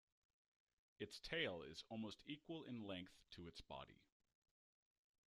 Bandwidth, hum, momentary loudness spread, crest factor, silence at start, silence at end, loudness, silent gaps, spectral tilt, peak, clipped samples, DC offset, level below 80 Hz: 13 kHz; none; 13 LU; 24 dB; 1 s; 1.3 s; -52 LUFS; none; -4.5 dB/octave; -32 dBFS; under 0.1%; under 0.1%; -76 dBFS